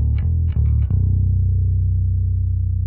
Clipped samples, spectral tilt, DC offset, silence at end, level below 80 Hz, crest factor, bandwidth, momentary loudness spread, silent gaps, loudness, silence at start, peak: under 0.1%; -13.5 dB/octave; under 0.1%; 0 s; -22 dBFS; 10 dB; 2.4 kHz; 2 LU; none; -19 LUFS; 0 s; -8 dBFS